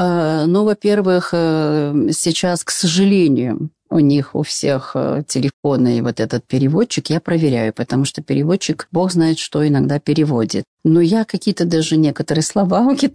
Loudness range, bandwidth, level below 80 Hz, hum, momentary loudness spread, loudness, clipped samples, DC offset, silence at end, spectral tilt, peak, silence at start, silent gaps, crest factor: 2 LU; 11 kHz; -54 dBFS; none; 5 LU; -16 LUFS; under 0.1%; 0.1%; 0.05 s; -5.5 dB/octave; -4 dBFS; 0 s; 5.53-5.63 s, 10.67-10.77 s; 10 dB